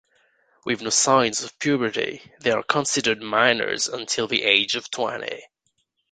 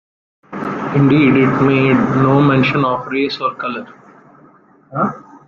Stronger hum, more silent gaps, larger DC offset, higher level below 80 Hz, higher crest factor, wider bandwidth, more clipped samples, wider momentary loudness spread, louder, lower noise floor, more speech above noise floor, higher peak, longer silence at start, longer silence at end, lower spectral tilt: neither; neither; neither; second, -64 dBFS vs -52 dBFS; first, 22 dB vs 14 dB; first, 9.6 kHz vs 6.8 kHz; neither; second, 10 LU vs 13 LU; second, -22 LUFS vs -14 LUFS; first, -72 dBFS vs -48 dBFS; first, 49 dB vs 34 dB; about the same, -2 dBFS vs 0 dBFS; first, 0.65 s vs 0.5 s; first, 0.65 s vs 0.1 s; second, -2 dB/octave vs -8.5 dB/octave